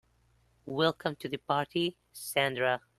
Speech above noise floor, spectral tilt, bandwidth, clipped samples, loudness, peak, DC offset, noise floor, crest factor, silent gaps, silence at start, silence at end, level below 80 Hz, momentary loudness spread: 37 dB; -4.5 dB/octave; 13 kHz; under 0.1%; -31 LUFS; -12 dBFS; under 0.1%; -68 dBFS; 20 dB; none; 0.65 s; 0.2 s; -70 dBFS; 10 LU